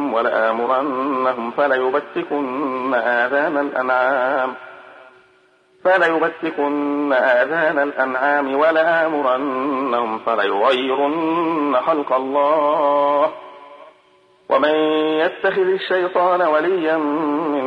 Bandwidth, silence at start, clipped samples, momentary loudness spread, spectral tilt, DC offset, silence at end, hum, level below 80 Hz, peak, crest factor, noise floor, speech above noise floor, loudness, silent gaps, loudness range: 9.4 kHz; 0 s; under 0.1%; 5 LU; -6 dB/octave; under 0.1%; 0 s; none; -72 dBFS; -4 dBFS; 14 dB; -55 dBFS; 37 dB; -18 LUFS; none; 3 LU